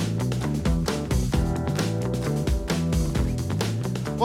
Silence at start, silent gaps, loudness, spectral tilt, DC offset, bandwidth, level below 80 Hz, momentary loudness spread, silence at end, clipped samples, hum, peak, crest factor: 0 s; none; -26 LUFS; -6 dB/octave; under 0.1%; 16.5 kHz; -32 dBFS; 2 LU; 0 s; under 0.1%; none; -8 dBFS; 16 dB